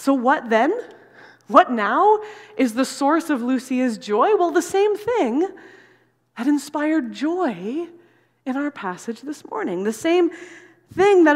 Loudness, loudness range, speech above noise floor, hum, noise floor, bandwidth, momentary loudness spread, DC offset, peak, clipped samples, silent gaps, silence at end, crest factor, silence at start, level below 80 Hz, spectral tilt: -20 LUFS; 6 LU; 39 dB; none; -58 dBFS; 15.5 kHz; 13 LU; under 0.1%; 0 dBFS; under 0.1%; none; 0 s; 20 dB; 0 s; -68 dBFS; -4.5 dB/octave